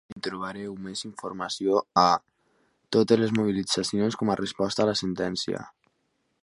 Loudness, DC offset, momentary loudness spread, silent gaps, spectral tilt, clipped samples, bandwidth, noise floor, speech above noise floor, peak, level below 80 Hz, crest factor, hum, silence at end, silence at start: -26 LUFS; under 0.1%; 13 LU; 0.12-0.16 s; -5 dB/octave; under 0.1%; 11.5 kHz; -74 dBFS; 48 dB; -4 dBFS; -62 dBFS; 24 dB; none; 0.75 s; 0.1 s